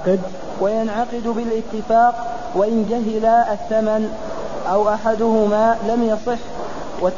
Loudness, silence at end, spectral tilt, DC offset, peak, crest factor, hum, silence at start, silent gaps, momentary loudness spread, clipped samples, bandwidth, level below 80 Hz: -19 LUFS; 0 s; -6.5 dB/octave; 3%; -4 dBFS; 14 dB; none; 0 s; none; 11 LU; under 0.1%; 7.4 kHz; -44 dBFS